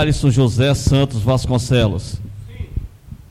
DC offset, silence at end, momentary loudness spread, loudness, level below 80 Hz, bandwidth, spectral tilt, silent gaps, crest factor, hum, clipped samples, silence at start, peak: under 0.1%; 0.15 s; 16 LU; -16 LUFS; -30 dBFS; 14 kHz; -6 dB/octave; none; 14 dB; none; under 0.1%; 0 s; -2 dBFS